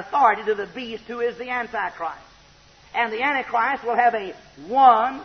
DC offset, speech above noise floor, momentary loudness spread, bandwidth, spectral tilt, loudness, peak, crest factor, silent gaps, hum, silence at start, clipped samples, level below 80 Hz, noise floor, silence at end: under 0.1%; 30 dB; 17 LU; 6.4 kHz; -4.5 dB/octave; -22 LUFS; -4 dBFS; 18 dB; none; none; 0 s; under 0.1%; -60 dBFS; -52 dBFS; 0 s